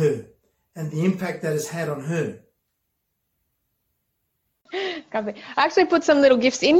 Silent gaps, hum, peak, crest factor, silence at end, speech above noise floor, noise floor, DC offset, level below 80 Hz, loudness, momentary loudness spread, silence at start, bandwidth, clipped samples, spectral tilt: none; none; -4 dBFS; 18 dB; 0 s; 56 dB; -76 dBFS; under 0.1%; -64 dBFS; -22 LUFS; 14 LU; 0 s; 16.5 kHz; under 0.1%; -5 dB/octave